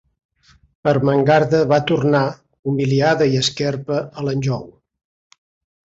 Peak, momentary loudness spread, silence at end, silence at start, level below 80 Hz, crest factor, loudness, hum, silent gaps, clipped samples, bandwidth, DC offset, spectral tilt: -4 dBFS; 9 LU; 1.15 s; 0.85 s; -52 dBFS; 16 dB; -18 LUFS; none; 2.59-2.63 s; under 0.1%; 8 kHz; under 0.1%; -6 dB/octave